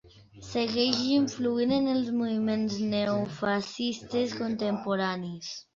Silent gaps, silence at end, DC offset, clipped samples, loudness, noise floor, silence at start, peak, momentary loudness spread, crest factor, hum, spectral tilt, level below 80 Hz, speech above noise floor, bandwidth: none; 0.15 s; under 0.1%; under 0.1%; -29 LUFS; -48 dBFS; 0.15 s; -8 dBFS; 7 LU; 22 dB; none; -5 dB/octave; -62 dBFS; 20 dB; 7.6 kHz